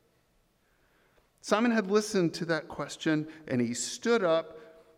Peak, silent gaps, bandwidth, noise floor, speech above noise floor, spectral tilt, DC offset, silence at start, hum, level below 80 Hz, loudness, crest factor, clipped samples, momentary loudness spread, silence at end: -12 dBFS; none; 15.5 kHz; -70 dBFS; 41 dB; -4.5 dB/octave; under 0.1%; 1.45 s; none; -70 dBFS; -29 LUFS; 20 dB; under 0.1%; 7 LU; 0.3 s